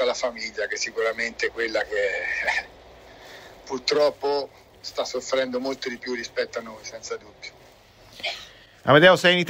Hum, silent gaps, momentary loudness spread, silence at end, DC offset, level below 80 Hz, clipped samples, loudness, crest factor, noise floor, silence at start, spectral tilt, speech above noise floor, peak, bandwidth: none; none; 21 LU; 0 s; under 0.1%; -58 dBFS; under 0.1%; -24 LUFS; 22 dB; -51 dBFS; 0 s; -3.5 dB/octave; 28 dB; -2 dBFS; 16 kHz